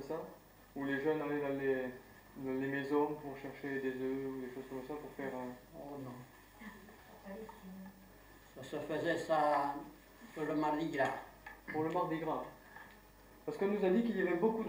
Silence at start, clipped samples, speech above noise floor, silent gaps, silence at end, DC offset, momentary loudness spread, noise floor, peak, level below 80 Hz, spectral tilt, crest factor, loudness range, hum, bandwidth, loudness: 0 s; under 0.1%; 23 dB; none; 0 s; under 0.1%; 21 LU; -60 dBFS; -20 dBFS; -68 dBFS; -6.5 dB/octave; 18 dB; 11 LU; none; 16 kHz; -38 LUFS